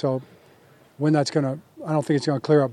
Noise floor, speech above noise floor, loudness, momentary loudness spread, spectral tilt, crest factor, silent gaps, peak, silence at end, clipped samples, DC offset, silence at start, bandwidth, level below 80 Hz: -54 dBFS; 32 dB; -24 LUFS; 9 LU; -7 dB/octave; 16 dB; none; -8 dBFS; 0 s; under 0.1%; under 0.1%; 0 s; 11 kHz; -76 dBFS